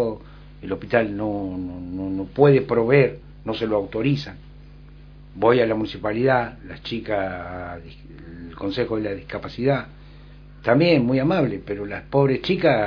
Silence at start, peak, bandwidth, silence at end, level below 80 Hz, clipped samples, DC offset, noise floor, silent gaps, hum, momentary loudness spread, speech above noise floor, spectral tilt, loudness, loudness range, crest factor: 0 s; -2 dBFS; 5.4 kHz; 0 s; -46 dBFS; under 0.1%; under 0.1%; -43 dBFS; none; 50 Hz at -45 dBFS; 18 LU; 22 dB; -8.5 dB/octave; -22 LUFS; 6 LU; 22 dB